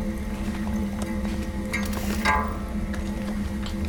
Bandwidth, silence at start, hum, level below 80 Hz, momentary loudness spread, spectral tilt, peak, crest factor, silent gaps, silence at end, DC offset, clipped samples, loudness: 19 kHz; 0 s; none; -32 dBFS; 7 LU; -5.5 dB/octave; -10 dBFS; 18 dB; none; 0 s; under 0.1%; under 0.1%; -28 LUFS